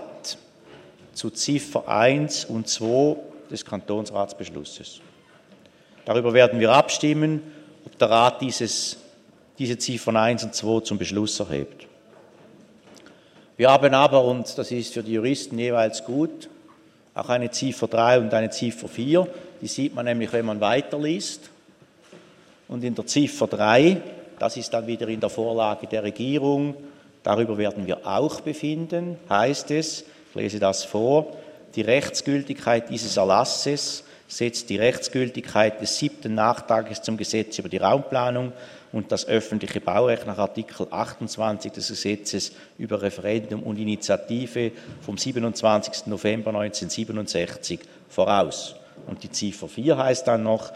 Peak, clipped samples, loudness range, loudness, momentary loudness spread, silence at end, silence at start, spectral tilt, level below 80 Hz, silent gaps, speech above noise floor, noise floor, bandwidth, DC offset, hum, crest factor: -2 dBFS; under 0.1%; 6 LU; -23 LUFS; 14 LU; 0 s; 0 s; -4.5 dB/octave; -64 dBFS; none; 31 dB; -55 dBFS; 14 kHz; under 0.1%; none; 22 dB